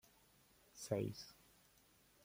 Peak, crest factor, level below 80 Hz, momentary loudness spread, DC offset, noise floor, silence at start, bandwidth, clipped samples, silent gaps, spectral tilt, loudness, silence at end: -26 dBFS; 24 dB; -76 dBFS; 25 LU; under 0.1%; -72 dBFS; 0.75 s; 16.5 kHz; under 0.1%; none; -5.5 dB/octave; -46 LUFS; 0.9 s